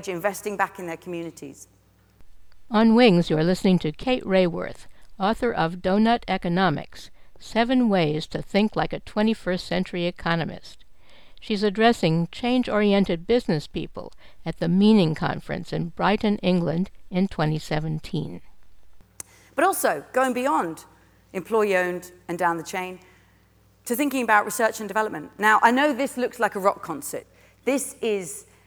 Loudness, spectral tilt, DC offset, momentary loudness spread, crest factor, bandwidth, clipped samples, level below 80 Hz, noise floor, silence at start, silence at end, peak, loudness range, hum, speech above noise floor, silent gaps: -23 LUFS; -5.5 dB/octave; under 0.1%; 15 LU; 20 dB; over 20 kHz; under 0.1%; -48 dBFS; -58 dBFS; 0 s; 0.1 s; -4 dBFS; 5 LU; none; 35 dB; none